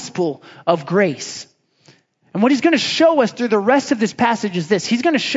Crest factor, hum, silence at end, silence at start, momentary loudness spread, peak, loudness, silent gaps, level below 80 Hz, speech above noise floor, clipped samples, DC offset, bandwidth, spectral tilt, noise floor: 18 dB; none; 0 s; 0 s; 10 LU; 0 dBFS; -17 LUFS; none; -68 dBFS; 36 dB; under 0.1%; under 0.1%; 7.8 kHz; -4.5 dB/octave; -53 dBFS